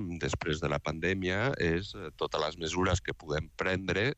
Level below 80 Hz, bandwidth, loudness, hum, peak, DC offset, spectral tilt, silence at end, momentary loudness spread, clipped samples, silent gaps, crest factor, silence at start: -48 dBFS; 8.4 kHz; -32 LUFS; none; -16 dBFS; under 0.1%; -5 dB/octave; 0.05 s; 6 LU; under 0.1%; none; 16 dB; 0 s